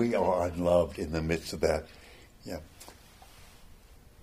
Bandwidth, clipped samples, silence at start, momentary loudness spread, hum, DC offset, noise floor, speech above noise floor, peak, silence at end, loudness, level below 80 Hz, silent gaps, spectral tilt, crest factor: 15.5 kHz; under 0.1%; 0 s; 24 LU; none; under 0.1%; -54 dBFS; 25 dB; -12 dBFS; 0.3 s; -29 LUFS; -48 dBFS; none; -6 dB/octave; 20 dB